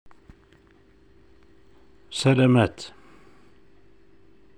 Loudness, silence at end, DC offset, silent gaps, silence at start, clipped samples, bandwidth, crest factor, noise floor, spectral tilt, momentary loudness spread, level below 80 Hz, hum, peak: -21 LUFS; 1.7 s; 0.2%; none; 2.1 s; under 0.1%; 10.5 kHz; 22 dB; -58 dBFS; -6.5 dB/octave; 23 LU; -58 dBFS; none; -4 dBFS